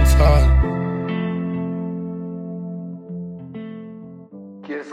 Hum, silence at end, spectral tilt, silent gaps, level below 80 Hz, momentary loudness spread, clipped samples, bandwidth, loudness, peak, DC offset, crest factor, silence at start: none; 0 s; -7 dB/octave; none; -22 dBFS; 23 LU; under 0.1%; 14 kHz; -22 LUFS; -2 dBFS; under 0.1%; 18 dB; 0 s